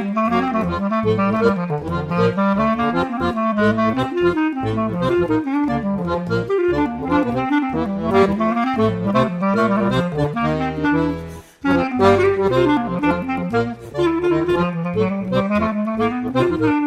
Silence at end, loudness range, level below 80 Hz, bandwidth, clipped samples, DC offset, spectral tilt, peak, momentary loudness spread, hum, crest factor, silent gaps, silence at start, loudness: 0 s; 2 LU; -42 dBFS; 12.5 kHz; under 0.1%; under 0.1%; -8 dB/octave; -2 dBFS; 5 LU; none; 16 dB; none; 0 s; -19 LUFS